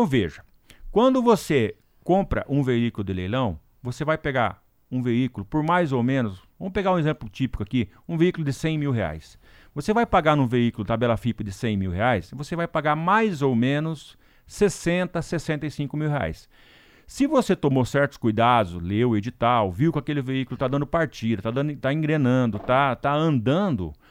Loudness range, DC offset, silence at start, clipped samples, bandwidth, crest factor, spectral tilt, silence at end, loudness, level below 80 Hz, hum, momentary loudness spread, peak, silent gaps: 3 LU; under 0.1%; 0 s; under 0.1%; 16 kHz; 18 dB; -7 dB/octave; 0.2 s; -24 LUFS; -46 dBFS; none; 9 LU; -4 dBFS; none